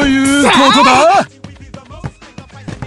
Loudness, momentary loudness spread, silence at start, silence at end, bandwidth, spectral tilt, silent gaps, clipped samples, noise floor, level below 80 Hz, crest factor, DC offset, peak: -8 LUFS; 23 LU; 0 s; 0 s; 12.5 kHz; -3.5 dB/octave; none; under 0.1%; -34 dBFS; -36 dBFS; 12 dB; under 0.1%; 0 dBFS